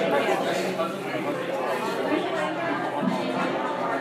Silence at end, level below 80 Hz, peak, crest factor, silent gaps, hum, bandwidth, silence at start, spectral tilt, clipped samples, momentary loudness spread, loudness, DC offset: 0 s; -74 dBFS; -10 dBFS; 16 dB; none; none; 15.5 kHz; 0 s; -5 dB/octave; under 0.1%; 4 LU; -26 LUFS; under 0.1%